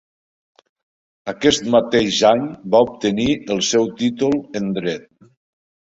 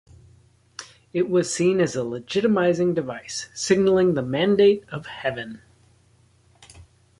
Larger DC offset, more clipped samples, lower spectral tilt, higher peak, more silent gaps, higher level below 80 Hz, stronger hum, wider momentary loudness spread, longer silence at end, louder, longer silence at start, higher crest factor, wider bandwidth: neither; neither; about the same, -4 dB/octave vs -5 dB/octave; first, -2 dBFS vs -6 dBFS; neither; first, -52 dBFS vs -58 dBFS; neither; second, 9 LU vs 17 LU; first, 0.95 s vs 0.4 s; first, -18 LUFS vs -22 LUFS; first, 1.25 s vs 0.8 s; about the same, 18 dB vs 18 dB; second, 8.2 kHz vs 11.5 kHz